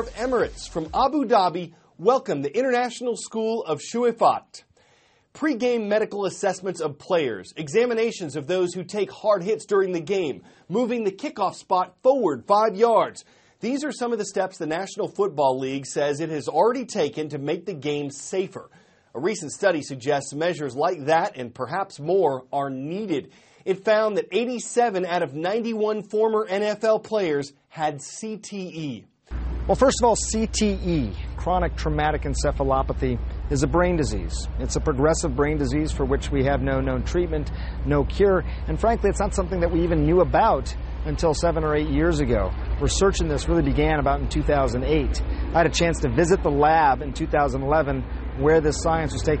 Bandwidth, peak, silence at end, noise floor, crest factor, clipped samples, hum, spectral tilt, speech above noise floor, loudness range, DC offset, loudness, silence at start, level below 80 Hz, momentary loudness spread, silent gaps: 8.8 kHz; -6 dBFS; 0 s; -60 dBFS; 18 dB; under 0.1%; none; -5.5 dB/octave; 38 dB; 4 LU; under 0.1%; -23 LUFS; 0 s; -32 dBFS; 9 LU; none